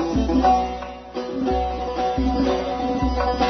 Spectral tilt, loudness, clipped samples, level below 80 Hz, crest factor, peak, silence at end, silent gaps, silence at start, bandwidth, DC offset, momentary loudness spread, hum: -6.5 dB/octave; -22 LUFS; under 0.1%; -30 dBFS; 14 dB; -6 dBFS; 0 s; none; 0 s; 6.4 kHz; under 0.1%; 11 LU; none